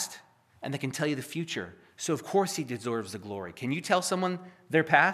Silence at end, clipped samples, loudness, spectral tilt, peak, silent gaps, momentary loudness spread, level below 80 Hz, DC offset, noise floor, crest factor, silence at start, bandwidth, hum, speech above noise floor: 0 s; under 0.1%; -30 LUFS; -4 dB/octave; -6 dBFS; none; 12 LU; -76 dBFS; under 0.1%; -54 dBFS; 24 dB; 0 s; 15 kHz; none; 24 dB